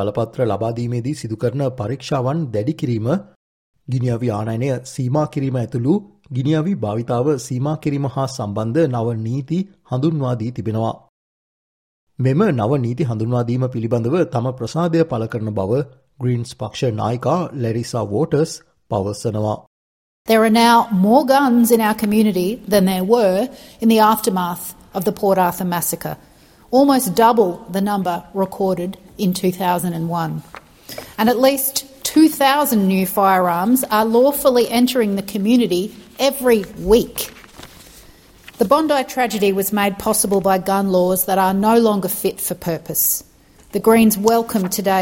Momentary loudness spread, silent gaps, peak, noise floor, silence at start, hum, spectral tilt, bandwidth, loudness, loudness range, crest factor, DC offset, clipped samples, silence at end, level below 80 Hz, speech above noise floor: 10 LU; 3.36-3.74 s, 11.09-12.07 s, 19.67-20.25 s; -2 dBFS; -45 dBFS; 0 s; none; -5.5 dB/octave; 17 kHz; -18 LUFS; 6 LU; 16 dB; under 0.1%; under 0.1%; 0 s; -50 dBFS; 28 dB